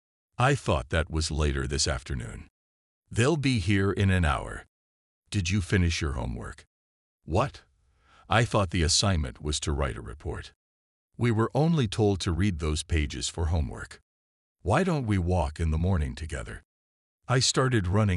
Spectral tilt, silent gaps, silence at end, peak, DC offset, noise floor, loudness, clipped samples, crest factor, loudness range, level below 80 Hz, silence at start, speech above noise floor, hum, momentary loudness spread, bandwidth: -5 dB/octave; 2.50-3.02 s, 4.68-5.22 s, 6.67-7.19 s, 10.56-11.09 s, 14.02-14.55 s, 16.65-17.19 s; 0 s; -8 dBFS; under 0.1%; -63 dBFS; -27 LUFS; under 0.1%; 20 dB; 2 LU; -40 dBFS; 0.4 s; 36 dB; none; 13 LU; 12 kHz